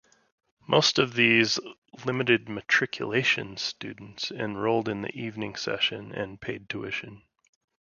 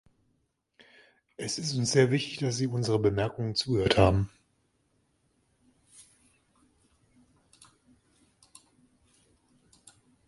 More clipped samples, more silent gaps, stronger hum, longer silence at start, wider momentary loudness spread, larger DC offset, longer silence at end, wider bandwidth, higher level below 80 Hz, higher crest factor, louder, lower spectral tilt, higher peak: neither; first, 1.78-1.82 s vs none; neither; second, 0.7 s vs 1.4 s; first, 14 LU vs 9 LU; neither; second, 0.75 s vs 6 s; second, 7.4 kHz vs 11.5 kHz; second, -64 dBFS vs -50 dBFS; about the same, 24 dB vs 26 dB; about the same, -26 LUFS vs -27 LUFS; about the same, -4 dB/octave vs -5 dB/octave; about the same, -6 dBFS vs -6 dBFS